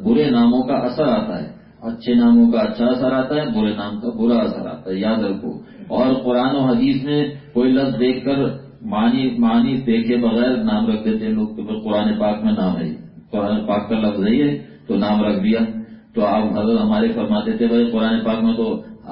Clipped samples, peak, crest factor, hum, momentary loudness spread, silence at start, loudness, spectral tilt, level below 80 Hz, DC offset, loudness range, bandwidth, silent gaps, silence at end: under 0.1%; -6 dBFS; 12 dB; none; 10 LU; 0 s; -18 LUFS; -12 dB/octave; -50 dBFS; under 0.1%; 3 LU; 5.4 kHz; none; 0 s